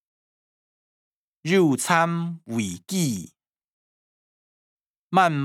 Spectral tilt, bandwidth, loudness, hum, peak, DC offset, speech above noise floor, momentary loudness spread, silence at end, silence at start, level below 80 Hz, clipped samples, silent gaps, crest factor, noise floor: -5 dB/octave; 16.5 kHz; -23 LUFS; none; -4 dBFS; under 0.1%; over 68 dB; 10 LU; 0 s; 1.45 s; -76 dBFS; under 0.1%; 3.64-5.11 s; 22 dB; under -90 dBFS